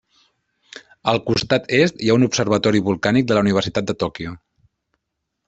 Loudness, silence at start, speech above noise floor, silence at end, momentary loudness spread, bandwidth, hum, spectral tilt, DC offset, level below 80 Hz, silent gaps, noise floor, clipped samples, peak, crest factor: -18 LUFS; 0.75 s; 60 dB; 1.1 s; 8 LU; 8.2 kHz; none; -5.5 dB/octave; under 0.1%; -52 dBFS; none; -78 dBFS; under 0.1%; -2 dBFS; 18 dB